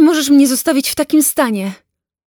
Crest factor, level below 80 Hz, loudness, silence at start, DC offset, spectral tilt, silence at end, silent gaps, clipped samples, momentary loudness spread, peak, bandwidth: 12 dB; -54 dBFS; -13 LUFS; 0 s; under 0.1%; -3 dB/octave; 0.55 s; none; under 0.1%; 9 LU; -2 dBFS; over 20 kHz